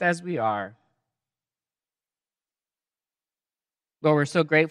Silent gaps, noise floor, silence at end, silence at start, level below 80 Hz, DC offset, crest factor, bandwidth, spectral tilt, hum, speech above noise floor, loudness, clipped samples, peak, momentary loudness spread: none; under -90 dBFS; 0 s; 0 s; -82 dBFS; under 0.1%; 22 dB; 11.5 kHz; -6 dB/octave; none; over 67 dB; -24 LUFS; under 0.1%; -6 dBFS; 9 LU